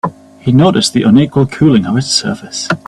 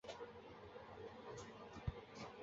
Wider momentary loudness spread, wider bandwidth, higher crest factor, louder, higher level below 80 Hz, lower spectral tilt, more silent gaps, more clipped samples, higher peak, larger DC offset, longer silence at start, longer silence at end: first, 11 LU vs 7 LU; first, 12.5 kHz vs 7.6 kHz; second, 12 dB vs 22 dB; first, -11 LUFS vs -54 LUFS; first, -44 dBFS vs -62 dBFS; about the same, -5.5 dB/octave vs -5 dB/octave; neither; neither; first, 0 dBFS vs -30 dBFS; neither; about the same, 0.05 s vs 0.05 s; about the same, 0.1 s vs 0 s